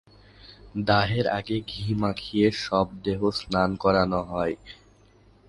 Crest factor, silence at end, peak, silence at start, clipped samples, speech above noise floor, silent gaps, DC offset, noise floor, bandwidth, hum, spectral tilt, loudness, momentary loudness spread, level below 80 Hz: 20 dB; 0.75 s; -6 dBFS; 0.45 s; under 0.1%; 32 dB; none; under 0.1%; -56 dBFS; 11.5 kHz; none; -6.5 dB/octave; -25 LUFS; 8 LU; -48 dBFS